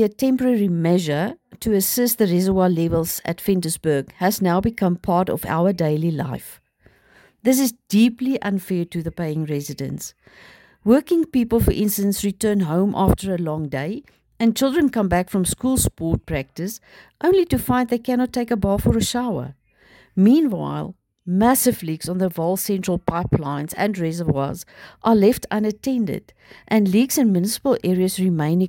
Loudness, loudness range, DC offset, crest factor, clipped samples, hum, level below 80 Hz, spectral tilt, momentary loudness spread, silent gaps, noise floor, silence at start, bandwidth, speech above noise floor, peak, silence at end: -20 LUFS; 3 LU; under 0.1%; 16 dB; under 0.1%; none; -40 dBFS; -5.5 dB/octave; 10 LU; none; -56 dBFS; 0 s; 17 kHz; 36 dB; -4 dBFS; 0 s